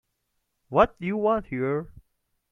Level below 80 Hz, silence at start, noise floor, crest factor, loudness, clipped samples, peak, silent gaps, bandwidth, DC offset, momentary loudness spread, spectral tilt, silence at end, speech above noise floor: -50 dBFS; 0.7 s; -77 dBFS; 22 dB; -25 LUFS; under 0.1%; -6 dBFS; none; 6.8 kHz; under 0.1%; 8 LU; -8.5 dB/octave; 0.6 s; 52 dB